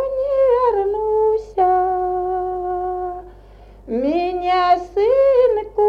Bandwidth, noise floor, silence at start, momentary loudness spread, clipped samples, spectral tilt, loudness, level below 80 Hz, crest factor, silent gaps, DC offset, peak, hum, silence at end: 6.8 kHz; -42 dBFS; 0 s; 9 LU; under 0.1%; -6.5 dB/octave; -18 LUFS; -44 dBFS; 14 dB; none; under 0.1%; -4 dBFS; none; 0 s